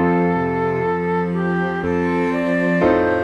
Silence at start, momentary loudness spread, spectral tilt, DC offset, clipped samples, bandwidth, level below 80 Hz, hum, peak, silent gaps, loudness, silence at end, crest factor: 0 s; 4 LU; -8.5 dB/octave; under 0.1%; under 0.1%; 7.8 kHz; -46 dBFS; none; -2 dBFS; none; -19 LUFS; 0 s; 16 dB